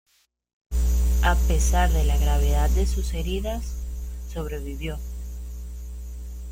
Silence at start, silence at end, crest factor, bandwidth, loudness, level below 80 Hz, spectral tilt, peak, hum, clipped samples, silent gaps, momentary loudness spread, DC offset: 0.7 s; 0 s; 18 dB; 16 kHz; -25 LUFS; -24 dBFS; -5 dB/octave; -6 dBFS; 60 Hz at -25 dBFS; under 0.1%; none; 16 LU; under 0.1%